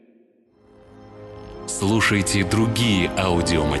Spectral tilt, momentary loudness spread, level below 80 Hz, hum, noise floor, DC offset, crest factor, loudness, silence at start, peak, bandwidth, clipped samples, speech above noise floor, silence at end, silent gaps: -4.5 dB/octave; 19 LU; -38 dBFS; none; -57 dBFS; under 0.1%; 14 dB; -20 LUFS; 0.95 s; -8 dBFS; 12.5 kHz; under 0.1%; 37 dB; 0 s; none